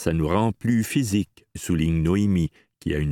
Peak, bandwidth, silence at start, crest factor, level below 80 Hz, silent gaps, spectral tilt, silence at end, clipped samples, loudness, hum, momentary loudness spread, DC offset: -6 dBFS; 17.5 kHz; 0 s; 16 dB; -38 dBFS; none; -6.5 dB/octave; 0 s; under 0.1%; -23 LUFS; none; 10 LU; under 0.1%